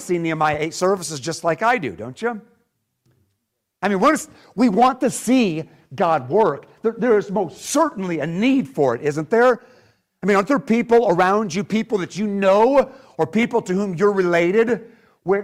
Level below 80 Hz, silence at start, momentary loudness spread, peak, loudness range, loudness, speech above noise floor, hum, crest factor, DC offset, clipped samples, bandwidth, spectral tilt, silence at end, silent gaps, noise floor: -58 dBFS; 0 s; 10 LU; -6 dBFS; 5 LU; -19 LUFS; 57 dB; none; 14 dB; under 0.1%; under 0.1%; 15.5 kHz; -5.5 dB/octave; 0 s; none; -75 dBFS